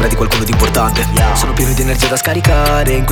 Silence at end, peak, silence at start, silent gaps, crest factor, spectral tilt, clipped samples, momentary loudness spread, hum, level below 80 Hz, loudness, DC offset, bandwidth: 0 s; 0 dBFS; 0 s; none; 12 dB; -4.5 dB/octave; under 0.1%; 2 LU; none; -16 dBFS; -13 LUFS; under 0.1%; 19.5 kHz